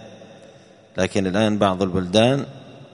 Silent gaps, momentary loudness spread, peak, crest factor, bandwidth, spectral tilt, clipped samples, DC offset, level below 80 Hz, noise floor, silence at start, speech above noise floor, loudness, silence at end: none; 17 LU; -2 dBFS; 20 dB; 10.5 kHz; -5.5 dB/octave; under 0.1%; under 0.1%; -52 dBFS; -48 dBFS; 0 s; 29 dB; -20 LUFS; 0.1 s